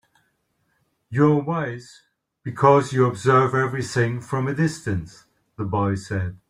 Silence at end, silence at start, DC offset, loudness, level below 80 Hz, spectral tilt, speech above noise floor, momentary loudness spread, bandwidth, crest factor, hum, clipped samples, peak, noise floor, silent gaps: 0.15 s; 1.1 s; under 0.1%; -21 LUFS; -56 dBFS; -7 dB/octave; 49 dB; 14 LU; 12 kHz; 20 dB; none; under 0.1%; -2 dBFS; -70 dBFS; none